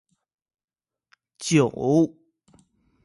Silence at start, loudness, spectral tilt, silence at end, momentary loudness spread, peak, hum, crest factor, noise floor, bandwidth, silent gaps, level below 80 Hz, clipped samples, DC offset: 1.4 s; -22 LUFS; -6 dB/octave; 0.95 s; 7 LU; -8 dBFS; none; 20 dB; -66 dBFS; 11.5 kHz; none; -64 dBFS; under 0.1%; under 0.1%